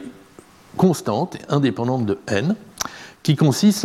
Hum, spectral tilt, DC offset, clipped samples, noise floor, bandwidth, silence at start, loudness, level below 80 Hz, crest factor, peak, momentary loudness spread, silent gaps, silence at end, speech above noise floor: none; -6 dB/octave; under 0.1%; under 0.1%; -47 dBFS; 16 kHz; 0 s; -21 LUFS; -58 dBFS; 16 dB; -4 dBFS; 12 LU; none; 0 s; 28 dB